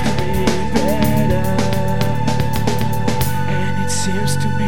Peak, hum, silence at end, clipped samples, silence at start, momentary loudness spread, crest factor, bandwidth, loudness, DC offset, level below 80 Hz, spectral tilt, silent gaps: -2 dBFS; none; 0 s; under 0.1%; 0 s; 3 LU; 16 dB; 18 kHz; -18 LUFS; 10%; -32 dBFS; -5.5 dB/octave; none